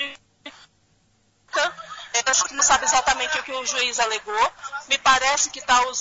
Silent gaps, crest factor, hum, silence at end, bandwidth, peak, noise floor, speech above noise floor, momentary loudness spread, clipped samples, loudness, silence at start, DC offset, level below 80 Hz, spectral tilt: none; 18 dB; none; 0 s; 8 kHz; -4 dBFS; -63 dBFS; 42 dB; 9 LU; under 0.1%; -20 LUFS; 0 s; under 0.1%; -52 dBFS; 1.5 dB/octave